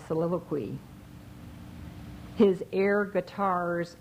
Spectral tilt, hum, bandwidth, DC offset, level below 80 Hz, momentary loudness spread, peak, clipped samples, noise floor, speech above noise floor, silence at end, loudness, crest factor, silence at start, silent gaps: -7.5 dB/octave; none; 15.5 kHz; under 0.1%; -56 dBFS; 22 LU; -10 dBFS; under 0.1%; -47 dBFS; 19 dB; 0.05 s; -28 LUFS; 20 dB; 0 s; none